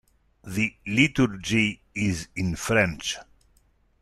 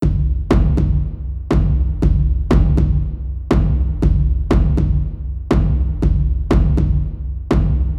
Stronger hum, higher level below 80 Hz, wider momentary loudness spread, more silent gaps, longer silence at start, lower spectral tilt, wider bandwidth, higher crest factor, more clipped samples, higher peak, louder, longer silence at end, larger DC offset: neither; second, -50 dBFS vs -18 dBFS; first, 10 LU vs 7 LU; neither; first, 0.45 s vs 0 s; second, -4.5 dB/octave vs -9 dB/octave; first, 14 kHz vs 6.8 kHz; first, 20 dB vs 14 dB; neither; second, -6 dBFS vs -2 dBFS; second, -25 LUFS vs -18 LUFS; first, 0.8 s vs 0 s; neither